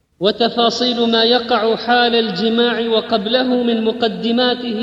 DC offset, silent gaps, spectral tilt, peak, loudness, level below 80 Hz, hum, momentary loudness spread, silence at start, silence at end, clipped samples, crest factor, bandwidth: under 0.1%; none; -4.5 dB/octave; -2 dBFS; -15 LUFS; -56 dBFS; none; 4 LU; 0.2 s; 0 s; under 0.1%; 14 dB; 7.6 kHz